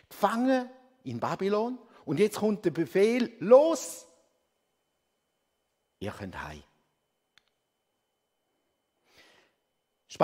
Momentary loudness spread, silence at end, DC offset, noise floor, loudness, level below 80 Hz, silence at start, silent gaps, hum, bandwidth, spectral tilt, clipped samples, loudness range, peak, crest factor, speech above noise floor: 21 LU; 0 s; under 0.1%; -80 dBFS; -27 LUFS; -66 dBFS; 0.1 s; none; none; 16 kHz; -5.5 dB/octave; under 0.1%; 19 LU; -8 dBFS; 24 dB; 53 dB